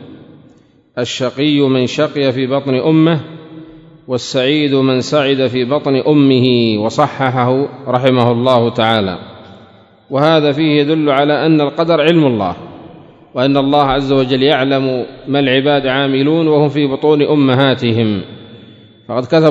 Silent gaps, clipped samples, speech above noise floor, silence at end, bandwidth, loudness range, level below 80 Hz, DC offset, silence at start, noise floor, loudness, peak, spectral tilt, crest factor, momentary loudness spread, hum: none; under 0.1%; 35 dB; 0 s; 8 kHz; 2 LU; -48 dBFS; under 0.1%; 0 s; -47 dBFS; -13 LUFS; 0 dBFS; -6.5 dB/octave; 14 dB; 10 LU; none